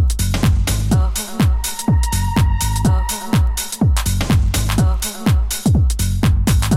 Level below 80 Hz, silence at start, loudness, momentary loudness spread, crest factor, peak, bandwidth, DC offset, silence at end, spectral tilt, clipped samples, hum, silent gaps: -20 dBFS; 0 s; -17 LUFS; 2 LU; 10 dB; -4 dBFS; 16.5 kHz; under 0.1%; 0 s; -5 dB/octave; under 0.1%; none; none